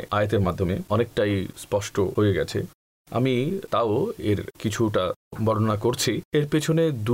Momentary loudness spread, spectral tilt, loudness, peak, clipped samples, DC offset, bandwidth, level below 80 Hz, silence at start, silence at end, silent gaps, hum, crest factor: 6 LU; -6 dB/octave; -24 LUFS; -12 dBFS; under 0.1%; under 0.1%; 16 kHz; -52 dBFS; 0 s; 0 s; 2.74-3.05 s, 5.16-5.31 s, 6.25-6.32 s; none; 12 dB